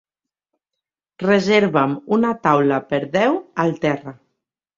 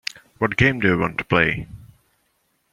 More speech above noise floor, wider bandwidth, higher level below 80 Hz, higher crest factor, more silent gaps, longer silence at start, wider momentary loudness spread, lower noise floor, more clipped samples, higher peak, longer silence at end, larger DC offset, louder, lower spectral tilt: first, 66 dB vs 48 dB; second, 7.6 kHz vs 15 kHz; second, -60 dBFS vs -46 dBFS; about the same, 18 dB vs 20 dB; neither; first, 1.2 s vs 0.4 s; second, 7 LU vs 14 LU; first, -84 dBFS vs -68 dBFS; neither; about the same, -2 dBFS vs -2 dBFS; second, 0.65 s vs 0.9 s; neither; about the same, -18 LUFS vs -20 LUFS; about the same, -6.5 dB/octave vs -6 dB/octave